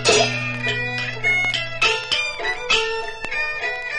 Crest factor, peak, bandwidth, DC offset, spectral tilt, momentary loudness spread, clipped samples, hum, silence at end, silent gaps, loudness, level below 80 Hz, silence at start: 18 dB; -4 dBFS; 11.5 kHz; under 0.1%; -2 dB/octave; 7 LU; under 0.1%; none; 0 s; none; -20 LUFS; -44 dBFS; 0 s